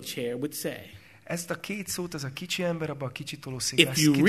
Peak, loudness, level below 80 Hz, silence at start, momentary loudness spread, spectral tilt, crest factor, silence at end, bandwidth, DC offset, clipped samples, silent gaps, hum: -2 dBFS; -29 LUFS; -62 dBFS; 0 s; 14 LU; -4 dB/octave; 28 dB; 0 s; 13.5 kHz; under 0.1%; under 0.1%; none; none